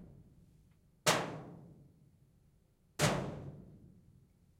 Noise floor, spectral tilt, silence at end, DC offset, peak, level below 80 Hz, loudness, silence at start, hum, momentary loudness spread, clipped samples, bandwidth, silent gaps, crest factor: -70 dBFS; -3.5 dB/octave; 0.75 s; under 0.1%; -14 dBFS; -64 dBFS; -35 LUFS; 0 s; none; 26 LU; under 0.1%; 16 kHz; none; 26 dB